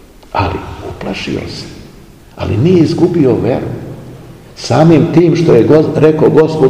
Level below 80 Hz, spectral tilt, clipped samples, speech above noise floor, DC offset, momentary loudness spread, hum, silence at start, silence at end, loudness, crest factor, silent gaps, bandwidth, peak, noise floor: -38 dBFS; -7.5 dB/octave; 2%; 27 dB; 0.3%; 18 LU; none; 0.3 s; 0 s; -10 LUFS; 12 dB; none; 10.5 kHz; 0 dBFS; -37 dBFS